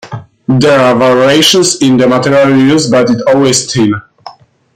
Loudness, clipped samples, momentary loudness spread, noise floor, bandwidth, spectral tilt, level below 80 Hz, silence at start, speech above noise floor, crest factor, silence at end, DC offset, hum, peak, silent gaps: -8 LUFS; under 0.1%; 7 LU; -33 dBFS; 16 kHz; -4.5 dB/octave; -46 dBFS; 0.05 s; 26 dB; 8 dB; 0.45 s; under 0.1%; none; 0 dBFS; none